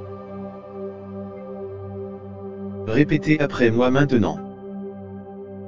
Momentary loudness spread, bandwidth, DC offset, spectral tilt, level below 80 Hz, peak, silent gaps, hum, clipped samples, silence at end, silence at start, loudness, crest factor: 17 LU; 7.6 kHz; under 0.1%; -7.5 dB/octave; -48 dBFS; -2 dBFS; none; none; under 0.1%; 0 s; 0 s; -22 LUFS; 20 dB